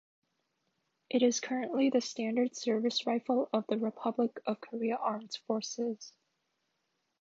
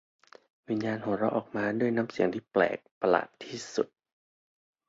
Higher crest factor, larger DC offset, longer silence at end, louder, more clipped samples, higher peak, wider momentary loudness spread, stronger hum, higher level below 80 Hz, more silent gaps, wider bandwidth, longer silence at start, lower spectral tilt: about the same, 18 dB vs 22 dB; neither; about the same, 1.15 s vs 1.05 s; second, -33 LUFS vs -30 LUFS; neither; second, -16 dBFS vs -8 dBFS; about the same, 8 LU vs 8 LU; neither; second, -88 dBFS vs -70 dBFS; second, none vs 2.91-3.01 s; about the same, 7.8 kHz vs 8 kHz; first, 1.1 s vs 0.7 s; second, -4 dB/octave vs -6 dB/octave